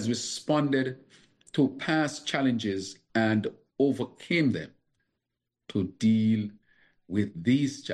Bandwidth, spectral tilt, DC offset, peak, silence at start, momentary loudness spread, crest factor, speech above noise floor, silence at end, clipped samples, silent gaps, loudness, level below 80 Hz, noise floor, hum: 11.5 kHz; -5.5 dB/octave; under 0.1%; -12 dBFS; 0 s; 9 LU; 16 dB; 58 dB; 0 s; under 0.1%; none; -28 LUFS; -68 dBFS; -85 dBFS; none